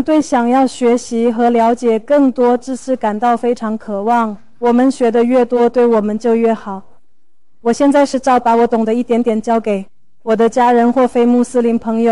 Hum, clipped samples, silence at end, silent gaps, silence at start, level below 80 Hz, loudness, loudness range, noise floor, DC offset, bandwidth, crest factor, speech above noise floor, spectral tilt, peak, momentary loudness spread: none; under 0.1%; 0 s; none; 0 s; -52 dBFS; -14 LUFS; 1 LU; -69 dBFS; 1%; 11.5 kHz; 8 dB; 56 dB; -5.5 dB/octave; -4 dBFS; 8 LU